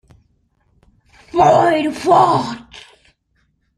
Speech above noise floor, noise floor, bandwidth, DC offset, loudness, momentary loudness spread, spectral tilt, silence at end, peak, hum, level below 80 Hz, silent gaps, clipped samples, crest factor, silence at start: 51 dB; -64 dBFS; 12 kHz; under 0.1%; -14 LUFS; 14 LU; -6 dB/octave; 0.95 s; -2 dBFS; none; -52 dBFS; none; under 0.1%; 16 dB; 1.35 s